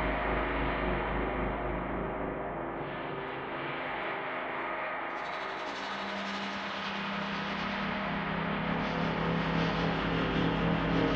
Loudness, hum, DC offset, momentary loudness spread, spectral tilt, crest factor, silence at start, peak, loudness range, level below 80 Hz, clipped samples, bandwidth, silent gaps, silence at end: -33 LUFS; none; under 0.1%; 7 LU; -6.5 dB/octave; 16 dB; 0 s; -16 dBFS; 5 LU; -44 dBFS; under 0.1%; 7.8 kHz; none; 0 s